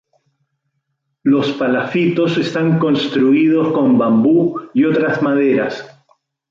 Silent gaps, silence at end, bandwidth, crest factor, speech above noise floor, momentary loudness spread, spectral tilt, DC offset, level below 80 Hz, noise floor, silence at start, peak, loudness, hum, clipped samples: none; 0.65 s; 7.4 kHz; 12 dB; 57 dB; 5 LU; -7.5 dB/octave; under 0.1%; -60 dBFS; -71 dBFS; 1.25 s; -4 dBFS; -15 LUFS; none; under 0.1%